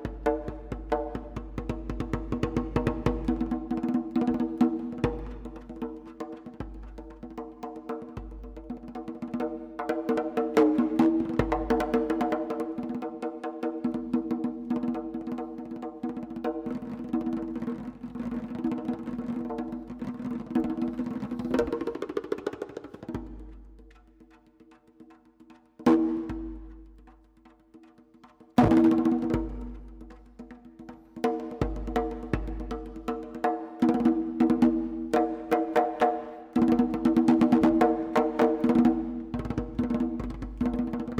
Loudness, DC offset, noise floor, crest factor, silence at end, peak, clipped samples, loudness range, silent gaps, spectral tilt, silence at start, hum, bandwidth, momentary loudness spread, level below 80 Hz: -29 LUFS; under 0.1%; -58 dBFS; 22 dB; 0 s; -6 dBFS; under 0.1%; 12 LU; none; -8 dB/octave; 0 s; none; 10.5 kHz; 18 LU; -44 dBFS